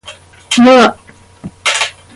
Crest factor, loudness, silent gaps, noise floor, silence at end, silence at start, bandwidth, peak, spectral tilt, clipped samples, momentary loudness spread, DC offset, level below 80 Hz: 12 dB; -10 LUFS; none; -36 dBFS; 0.25 s; 0.05 s; 11.5 kHz; 0 dBFS; -3 dB/octave; under 0.1%; 9 LU; under 0.1%; -48 dBFS